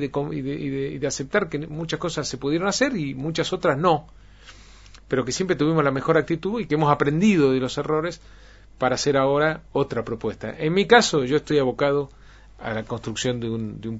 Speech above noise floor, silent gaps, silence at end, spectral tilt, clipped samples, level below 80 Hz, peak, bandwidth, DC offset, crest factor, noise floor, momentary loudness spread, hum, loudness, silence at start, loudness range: 24 dB; none; 0 s; -5 dB/octave; under 0.1%; -48 dBFS; 0 dBFS; 8 kHz; under 0.1%; 22 dB; -46 dBFS; 10 LU; none; -23 LUFS; 0 s; 4 LU